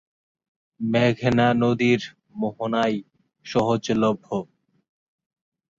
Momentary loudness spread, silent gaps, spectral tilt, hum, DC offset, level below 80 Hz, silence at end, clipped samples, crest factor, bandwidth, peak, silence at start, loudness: 11 LU; none; -6.5 dB/octave; none; under 0.1%; -58 dBFS; 1.35 s; under 0.1%; 18 dB; 7.6 kHz; -6 dBFS; 0.8 s; -23 LUFS